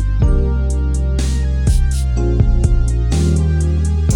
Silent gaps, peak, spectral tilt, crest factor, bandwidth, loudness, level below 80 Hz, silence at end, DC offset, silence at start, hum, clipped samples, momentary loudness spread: none; 0 dBFS; -7 dB/octave; 12 dB; 11.5 kHz; -17 LUFS; -16 dBFS; 0 s; under 0.1%; 0 s; none; under 0.1%; 3 LU